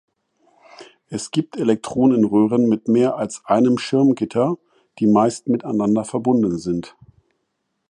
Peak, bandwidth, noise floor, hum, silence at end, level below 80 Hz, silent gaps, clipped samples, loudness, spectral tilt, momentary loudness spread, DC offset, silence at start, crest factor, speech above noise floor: -2 dBFS; 11 kHz; -73 dBFS; none; 1.05 s; -58 dBFS; none; under 0.1%; -19 LUFS; -6.5 dB/octave; 9 LU; under 0.1%; 0.8 s; 16 dB; 55 dB